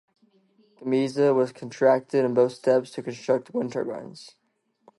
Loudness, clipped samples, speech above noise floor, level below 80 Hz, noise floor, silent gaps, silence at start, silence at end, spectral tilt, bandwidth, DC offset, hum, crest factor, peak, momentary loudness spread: -24 LUFS; under 0.1%; 38 dB; -78 dBFS; -62 dBFS; none; 0.8 s; 0.7 s; -6.5 dB/octave; 11.5 kHz; under 0.1%; none; 18 dB; -8 dBFS; 14 LU